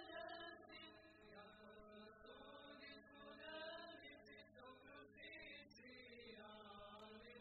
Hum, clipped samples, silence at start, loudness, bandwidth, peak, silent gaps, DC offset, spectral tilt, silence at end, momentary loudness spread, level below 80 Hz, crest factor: none; under 0.1%; 0 s; -59 LUFS; 4.5 kHz; -42 dBFS; none; under 0.1%; -1.5 dB/octave; 0 s; 9 LU; -80 dBFS; 18 dB